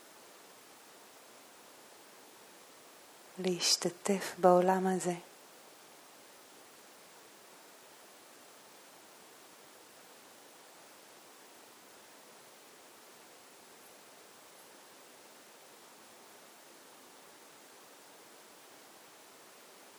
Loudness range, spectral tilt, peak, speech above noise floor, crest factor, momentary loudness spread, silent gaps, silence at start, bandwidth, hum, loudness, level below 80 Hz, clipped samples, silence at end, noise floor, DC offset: 23 LU; -3.5 dB/octave; -12 dBFS; 27 dB; 28 dB; 24 LU; none; 3.35 s; over 20 kHz; none; -30 LUFS; under -90 dBFS; under 0.1%; 14.75 s; -57 dBFS; under 0.1%